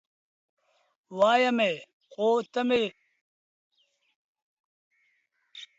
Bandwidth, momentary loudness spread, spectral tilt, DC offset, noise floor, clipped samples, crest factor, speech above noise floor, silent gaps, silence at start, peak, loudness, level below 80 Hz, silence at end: 8 kHz; 19 LU; -4.5 dB/octave; under 0.1%; -73 dBFS; under 0.1%; 20 dB; 48 dB; 1.93-2.00 s, 3.21-3.70 s, 4.16-4.35 s, 4.42-4.91 s; 1.1 s; -10 dBFS; -26 LUFS; -76 dBFS; 0.15 s